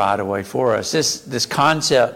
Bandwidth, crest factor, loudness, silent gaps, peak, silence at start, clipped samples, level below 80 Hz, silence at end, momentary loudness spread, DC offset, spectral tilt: 17 kHz; 14 dB; -18 LUFS; none; -4 dBFS; 0 s; under 0.1%; -56 dBFS; 0 s; 6 LU; under 0.1%; -3.5 dB/octave